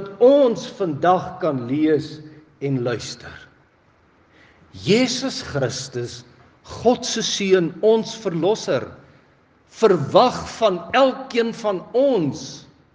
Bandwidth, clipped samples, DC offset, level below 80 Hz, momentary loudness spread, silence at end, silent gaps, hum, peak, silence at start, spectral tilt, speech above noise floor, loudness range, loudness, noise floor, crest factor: 10 kHz; under 0.1%; under 0.1%; -60 dBFS; 16 LU; 0.35 s; none; none; 0 dBFS; 0 s; -5 dB/octave; 37 dB; 6 LU; -20 LUFS; -57 dBFS; 20 dB